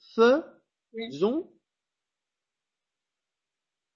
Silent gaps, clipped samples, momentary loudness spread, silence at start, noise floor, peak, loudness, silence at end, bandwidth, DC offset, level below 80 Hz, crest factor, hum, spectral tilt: none; under 0.1%; 17 LU; 0.15 s; -89 dBFS; -10 dBFS; -25 LUFS; 2.55 s; 7.2 kHz; under 0.1%; -76 dBFS; 20 dB; none; -6 dB/octave